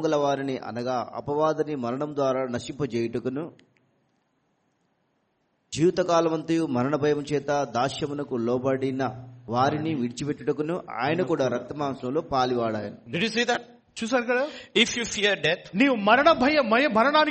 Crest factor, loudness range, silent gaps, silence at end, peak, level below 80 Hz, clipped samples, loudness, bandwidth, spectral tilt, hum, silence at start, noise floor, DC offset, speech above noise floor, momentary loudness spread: 20 dB; 8 LU; none; 0 s; -4 dBFS; -60 dBFS; under 0.1%; -25 LUFS; 8.4 kHz; -5 dB/octave; none; 0 s; -72 dBFS; under 0.1%; 47 dB; 10 LU